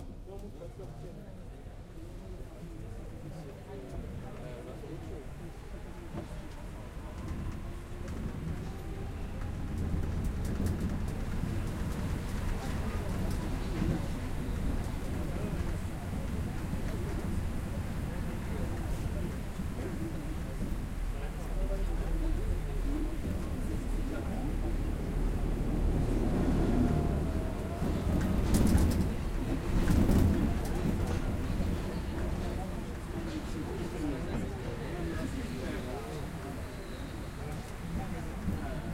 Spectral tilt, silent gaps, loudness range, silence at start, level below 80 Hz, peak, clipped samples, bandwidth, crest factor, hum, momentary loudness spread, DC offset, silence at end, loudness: -7 dB/octave; none; 13 LU; 0 s; -36 dBFS; -12 dBFS; under 0.1%; 16 kHz; 20 dB; none; 15 LU; under 0.1%; 0 s; -36 LUFS